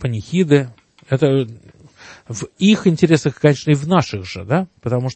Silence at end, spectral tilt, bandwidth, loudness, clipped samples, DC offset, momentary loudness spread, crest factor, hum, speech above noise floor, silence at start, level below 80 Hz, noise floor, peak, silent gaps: 0 s; -6.5 dB/octave; 8.8 kHz; -17 LUFS; under 0.1%; under 0.1%; 14 LU; 18 dB; none; 26 dB; 0 s; -52 dBFS; -43 dBFS; 0 dBFS; none